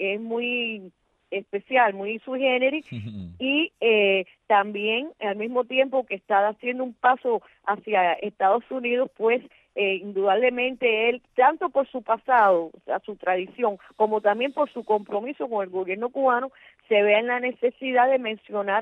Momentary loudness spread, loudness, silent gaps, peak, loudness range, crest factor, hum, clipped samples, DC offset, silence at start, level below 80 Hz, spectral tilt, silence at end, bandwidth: 9 LU; -24 LUFS; none; -8 dBFS; 3 LU; 16 dB; none; under 0.1%; under 0.1%; 0 s; -70 dBFS; -7 dB/octave; 0 s; 4.1 kHz